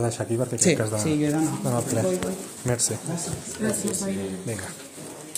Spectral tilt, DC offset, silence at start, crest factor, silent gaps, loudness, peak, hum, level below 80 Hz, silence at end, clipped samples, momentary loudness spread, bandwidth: -4.5 dB/octave; under 0.1%; 0 s; 20 dB; none; -25 LUFS; -6 dBFS; none; -56 dBFS; 0 s; under 0.1%; 11 LU; 16 kHz